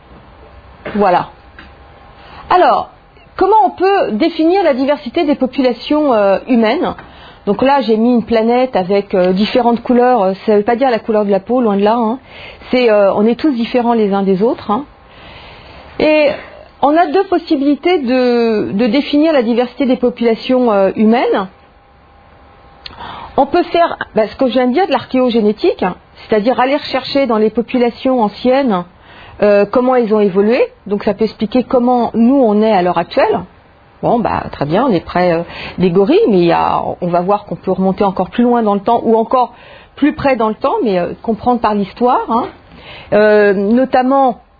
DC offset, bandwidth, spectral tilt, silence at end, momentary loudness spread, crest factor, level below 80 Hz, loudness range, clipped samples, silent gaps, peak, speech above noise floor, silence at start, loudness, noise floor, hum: under 0.1%; 5 kHz; -8.5 dB/octave; 0.25 s; 8 LU; 14 dB; -44 dBFS; 3 LU; under 0.1%; none; 0 dBFS; 32 dB; 0.55 s; -13 LUFS; -45 dBFS; none